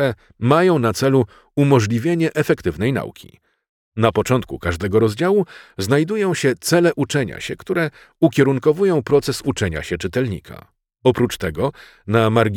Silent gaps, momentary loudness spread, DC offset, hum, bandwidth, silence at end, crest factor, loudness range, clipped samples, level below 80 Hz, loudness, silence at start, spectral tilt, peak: 3.69-3.92 s; 9 LU; under 0.1%; none; 18 kHz; 0 s; 16 dB; 3 LU; under 0.1%; -46 dBFS; -19 LUFS; 0 s; -6 dB/octave; -2 dBFS